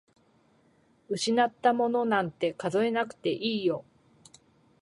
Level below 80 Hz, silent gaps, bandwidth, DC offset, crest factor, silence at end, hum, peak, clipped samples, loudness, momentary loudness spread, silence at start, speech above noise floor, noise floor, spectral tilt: -74 dBFS; none; 11.5 kHz; under 0.1%; 20 dB; 1 s; none; -10 dBFS; under 0.1%; -28 LUFS; 6 LU; 1.1 s; 38 dB; -65 dBFS; -4.5 dB/octave